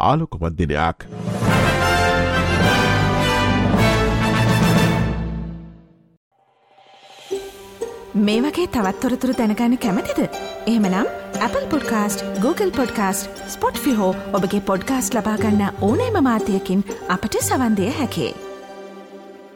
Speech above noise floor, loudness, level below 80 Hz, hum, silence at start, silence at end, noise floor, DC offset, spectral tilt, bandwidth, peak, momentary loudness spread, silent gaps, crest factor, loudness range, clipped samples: 35 dB; -19 LUFS; -36 dBFS; none; 0 s; 0 s; -55 dBFS; under 0.1%; -5.5 dB/octave; 17.5 kHz; -4 dBFS; 13 LU; 6.17-6.31 s; 16 dB; 6 LU; under 0.1%